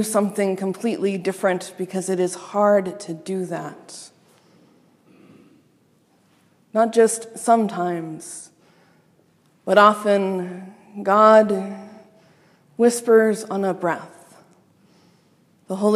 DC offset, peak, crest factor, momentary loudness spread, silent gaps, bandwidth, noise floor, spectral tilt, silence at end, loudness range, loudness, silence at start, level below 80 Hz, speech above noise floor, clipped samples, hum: under 0.1%; 0 dBFS; 22 dB; 21 LU; none; 15 kHz; -60 dBFS; -5 dB/octave; 0 s; 8 LU; -20 LUFS; 0 s; -78 dBFS; 40 dB; under 0.1%; none